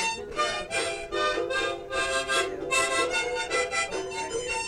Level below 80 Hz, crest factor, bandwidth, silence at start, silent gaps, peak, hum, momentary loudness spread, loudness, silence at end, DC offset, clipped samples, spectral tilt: -52 dBFS; 14 dB; 16.5 kHz; 0 s; none; -14 dBFS; none; 5 LU; -27 LUFS; 0 s; under 0.1%; under 0.1%; -1.5 dB/octave